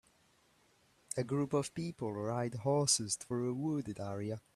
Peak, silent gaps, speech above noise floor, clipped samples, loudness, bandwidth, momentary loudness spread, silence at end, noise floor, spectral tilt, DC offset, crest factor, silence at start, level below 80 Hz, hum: -16 dBFS; none; 35 dB; under 0.1%; -36 LUFS; 13.5 kHz; 10 LU; 0.15 s; -70 dBFS; -4.5 dB/octave; under 0.1%; 22 dB; 1.15 s; -72 dBFS; none